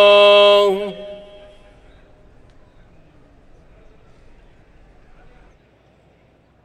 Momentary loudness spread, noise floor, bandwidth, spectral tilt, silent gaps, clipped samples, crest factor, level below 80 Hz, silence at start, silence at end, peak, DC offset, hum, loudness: 27 LU; -54 dBFS; 9.4 kHz; -3.5 dB/octave; none; under 0.1%; 20 dB; -50 dBFS; 0 s; 5.5 s; 0 dBFS; under 0.1%; none; -12 LUFS